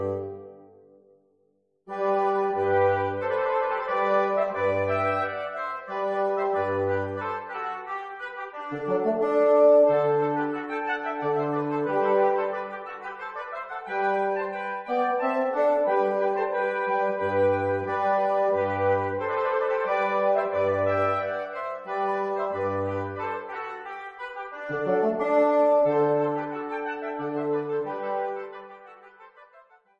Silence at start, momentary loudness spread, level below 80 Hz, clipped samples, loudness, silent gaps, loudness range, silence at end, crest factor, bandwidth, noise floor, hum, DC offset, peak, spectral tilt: 0 s; 12 LU; -70 dBFS; under 0.1%; -26 LUFS; none; 6 LU; 0.4 s; 18 dB; 6.8 kHz; -69 dBFS; none; under 0.1%; -8 dBFS; -8 dB/octave